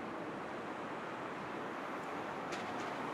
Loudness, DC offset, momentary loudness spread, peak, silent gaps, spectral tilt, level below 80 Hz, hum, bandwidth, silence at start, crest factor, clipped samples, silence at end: -42 LUFS; under 0.1%; 2 LU; -28 dBFS; none; -5 dB/octave; -76 dBFS; none; 16 kHz; 0 s; 16 dB; under 0.1%; 0 s